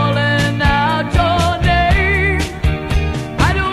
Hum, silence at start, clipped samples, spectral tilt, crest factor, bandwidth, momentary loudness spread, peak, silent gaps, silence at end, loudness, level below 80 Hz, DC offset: none; 0 s; under 0.1%; -5.5 dB/octave; 14 dB; 13.5 kHz; 6 LU; 0 dBFS; none; 0 s; -15 LUFS; -22 dBFS; 0.3%